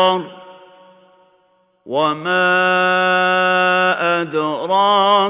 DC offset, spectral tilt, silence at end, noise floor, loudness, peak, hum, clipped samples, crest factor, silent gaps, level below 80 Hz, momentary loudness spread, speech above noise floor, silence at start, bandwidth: under 0.1%; -8 dB/octave; 0 s; -59 dBFS; -15 LUFS; -2 dBFS; none; under 0.1%; 14 dB; none; -72 dBFS; 7 LU; 43 dB; 0 s; 4 kHz